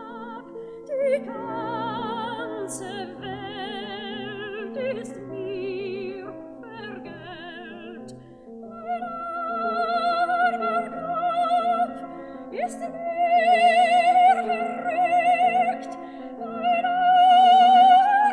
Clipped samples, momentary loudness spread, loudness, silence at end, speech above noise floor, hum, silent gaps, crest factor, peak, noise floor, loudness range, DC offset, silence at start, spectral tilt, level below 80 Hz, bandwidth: under 0.1%; 21 LU; -22 LUFS; 0 s; 13 dB; none; none; 16 dB; -6 dBFS; -43 dBFS; 14 LU; under 0.1%; 0 s; -4 dB/octave; -66 dBFS; 11 kHz